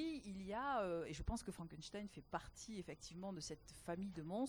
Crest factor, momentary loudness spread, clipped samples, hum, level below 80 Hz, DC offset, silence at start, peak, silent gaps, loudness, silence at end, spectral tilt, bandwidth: 18 dB; 10 LU; under 0.1%; none; -60 dBFS; under 0.1%; 0 s; -30 dBFS; none; -48 LUFS; 0 s; -5 dB/octave; over 20 kHz